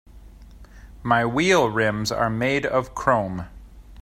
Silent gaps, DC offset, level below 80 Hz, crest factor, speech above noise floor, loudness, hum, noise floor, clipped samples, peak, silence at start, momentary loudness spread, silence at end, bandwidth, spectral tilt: none; under 0.1%; -44 dBFS; 20 dB; 23 dB; -21 LUFS; none; -44 dBFS; under 0.1%; -4 dBFS; 0.15 s; 13 LU; 0 s; 16 kHz; -5 dB/octave